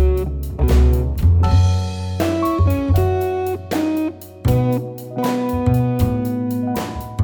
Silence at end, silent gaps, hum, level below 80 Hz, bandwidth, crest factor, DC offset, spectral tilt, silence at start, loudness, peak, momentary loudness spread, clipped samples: 0 s; none; none; -22 dBFS; over 20 kHz; 12 dB; under 0.1%; -8 dB/octave; 0 s; -19 LUFS; -4 dBFS; 9 LU; under 0.1%